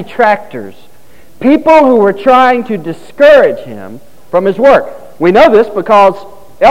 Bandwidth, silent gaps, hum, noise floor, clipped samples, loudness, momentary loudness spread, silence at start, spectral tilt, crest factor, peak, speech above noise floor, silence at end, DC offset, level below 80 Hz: 15.5 kHz; none; none; -43 dBFS; 3%; -8 LUFS; 19 LU; 0 s; -6 dB/octave; 8 dB; 0 dBFS; 35 dB; 0 s; 3%; -44 dBFS